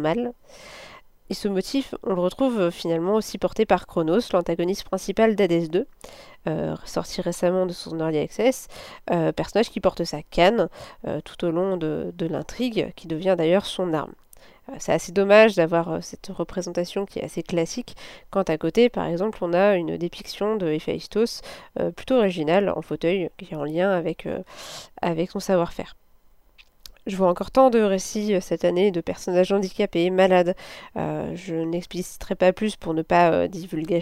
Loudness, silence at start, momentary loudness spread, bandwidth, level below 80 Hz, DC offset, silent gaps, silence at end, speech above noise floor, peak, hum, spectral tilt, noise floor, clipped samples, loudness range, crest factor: -23 LUFS; 0 s; 13 LU; 16 kHz; -50 dBFS; under 0.1%; none; 0 s; 31 dB; -2 dBFS; none; -5.5 dB/octave; -54 dBFS; under 0.1%; 4 LU; 22 dB